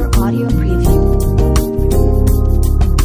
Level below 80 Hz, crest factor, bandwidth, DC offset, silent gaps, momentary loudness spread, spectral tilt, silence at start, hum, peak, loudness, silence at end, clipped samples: -14 dBFS; 10 dB; 16 kHz; under 0.1%; none; 2 LU; -7 dB/octave; 0 s; none; 0 dBFS; -14 LUFS; 0 s; under 0.1%